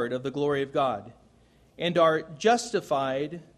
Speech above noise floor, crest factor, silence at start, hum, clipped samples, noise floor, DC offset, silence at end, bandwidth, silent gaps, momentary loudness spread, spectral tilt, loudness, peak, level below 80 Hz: 33 dB; 18 dB; 0 s; none; under 0.1%; -60 dBFS; under 0.1%; 0.15 s; 13 kHz; none; 8 LU; -4.5 dB/octave; -27 LUFS; -8 dBFS; -64 dBFS